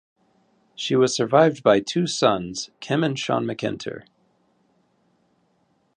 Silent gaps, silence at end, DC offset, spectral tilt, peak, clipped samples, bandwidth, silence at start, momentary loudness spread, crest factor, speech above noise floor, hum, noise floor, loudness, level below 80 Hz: none; 1.95 s; under 0.1%; -5 dB/octave; -2 dBFS; under 0.1%; 10 kHz; 0.8 s; 14 LU; 22 dB; 45 dB; none; -66 dBFS; -22 LUFS; -62 dBFS